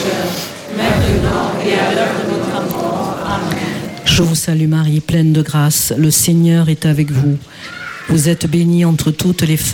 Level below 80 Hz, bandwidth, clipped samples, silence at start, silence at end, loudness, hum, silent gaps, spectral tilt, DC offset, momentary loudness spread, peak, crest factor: -34 dBFS; 17.5 kHz; under 0.1%; 0 s; 0 s; -14 LUFS; none; none; -5 dB/octave; under 0.1%; 8 LU; -2 dBFS; 12 dB